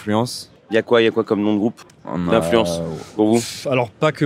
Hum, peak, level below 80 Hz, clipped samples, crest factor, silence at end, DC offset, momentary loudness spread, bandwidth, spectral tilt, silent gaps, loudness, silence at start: none; -2 dBFS; -56 dBFS; under 0.1%; 18 dB; 0 s; under 0.1%; 10 LU; 16 kHz; -5.5 dB/octave; none; -19 LUFS; 0 s